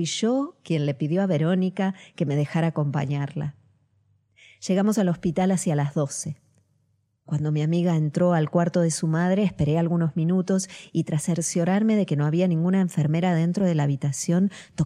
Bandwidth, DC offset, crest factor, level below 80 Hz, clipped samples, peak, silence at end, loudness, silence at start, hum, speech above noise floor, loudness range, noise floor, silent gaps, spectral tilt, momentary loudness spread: 13 kHz; under 0.1%; 16 dB; -58 dBFS; under 0.1%; -8 dBFS; 0 s; -24 LUFS; 0 s; none; 46 dB; 4 LU; -69 dBFS; none; -6.5 dB/octave; 6 LU